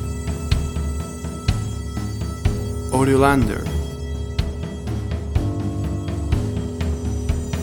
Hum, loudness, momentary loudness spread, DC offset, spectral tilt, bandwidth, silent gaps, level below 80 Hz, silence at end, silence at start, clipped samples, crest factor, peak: none; -23 LUFS; 10 LU; under 0.1%; -6.5 dB/octave; 19 kHz; none; -28 dBFS; 0 s; 0 s; under 0.1%; 20 dB; -2 dBFS